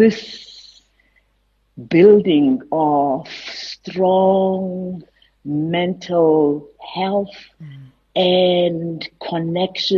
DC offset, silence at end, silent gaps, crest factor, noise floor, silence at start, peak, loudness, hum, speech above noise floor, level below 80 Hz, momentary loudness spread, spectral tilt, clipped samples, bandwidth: under 0.1%; 0 s; none; 16 dB; -63 dBFS; 0 s; -2 dBFS; -17 LUFS; none; 46 dB; -58 dBFS; 20 LU; -7 dB/octave; under 0.1%; 7.2 kHz